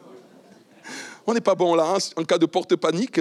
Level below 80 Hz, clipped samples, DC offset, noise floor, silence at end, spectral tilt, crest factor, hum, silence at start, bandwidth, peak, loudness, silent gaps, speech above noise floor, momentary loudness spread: -86 dBFS; under 0.1%; under 0.1%; -51 dBFS; 0 s; -4.5 dB/octave; 16 dB; none; 0.1 s; 12.5 kHz; -6 dBFS; -22 LUFS; none; 30 dB; 15 LU